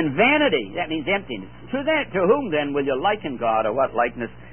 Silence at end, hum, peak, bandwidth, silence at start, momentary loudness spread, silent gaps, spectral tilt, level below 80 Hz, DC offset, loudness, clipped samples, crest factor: 0 s; 60 Hz at -45 dBFS; -6 dBFS; 3.4 kHz; 0 s; 9 LU; none; -10 dB/octave; -52 dBFS; 0.6%; -22 LUFS; under 0.1%; 16 dB